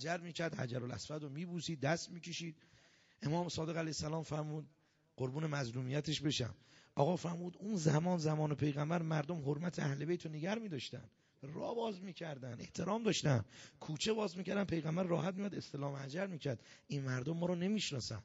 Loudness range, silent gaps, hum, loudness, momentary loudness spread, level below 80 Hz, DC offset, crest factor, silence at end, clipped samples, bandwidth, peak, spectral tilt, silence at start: 5 LU; none; none; -40 LUFS; 10 LU; -70 dBFS; under 0.1%; 22 dB; 0 s; under 0.1%; 7.6 kHz; -18 dBFS; -5.5 dB/octave; 0 s